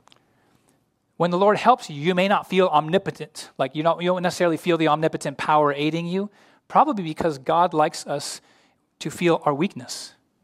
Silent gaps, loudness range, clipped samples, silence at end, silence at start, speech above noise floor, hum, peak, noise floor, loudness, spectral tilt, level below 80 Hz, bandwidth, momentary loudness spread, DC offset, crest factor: none; 3 LU; under 0.1%; 0.35 s; 1.2 s; 44 dB; none; -2 dBFS; -65 dBFS; -22 LUFS; -5.5 dB/octave; -66 dBFS; 15.5 kHz; 14 LU; under 0.1%; 20 dB